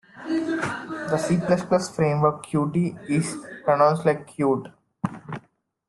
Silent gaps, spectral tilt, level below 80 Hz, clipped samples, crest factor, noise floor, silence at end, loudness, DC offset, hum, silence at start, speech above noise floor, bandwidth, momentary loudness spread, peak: none; -6.5 dB/octave; -60 dBFS; under 0.1%; 18 dB; -60 dBFS; 0.5 s; -24 LUFS; under 0.1%; none; 0.15 s; 37 dB; 12 kHz; 12 LU; -6 dBFS